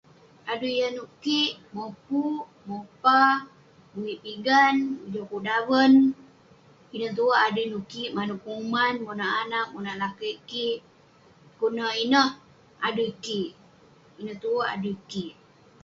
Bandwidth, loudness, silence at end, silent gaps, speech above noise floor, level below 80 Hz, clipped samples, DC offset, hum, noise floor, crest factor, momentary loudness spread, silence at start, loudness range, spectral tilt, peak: 7.4 kHz; -25 LUFS; 0.5 s; none; 31 dB; -68 dBFS; under 0.1%; under 0.1%; none; -56 dBFS; 20 dB; 17 LU; 0.45 s; 6 LU; -4.5 dB/octave; -6 dBFS